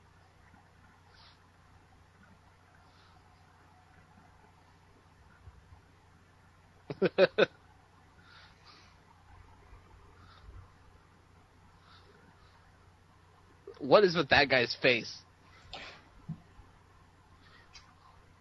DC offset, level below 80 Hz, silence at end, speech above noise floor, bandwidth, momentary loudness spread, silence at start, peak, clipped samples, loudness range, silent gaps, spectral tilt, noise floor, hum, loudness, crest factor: under 0.1%; -64 dBFS; 2.05 s; 35 dB; 11.5 kHz; 31 LU; 6.9 s; -8 dBFS; under 0.1%; 12 LU; none; -5 dB/octave; -61 dBFS; none; -27 LUFS; 28 dB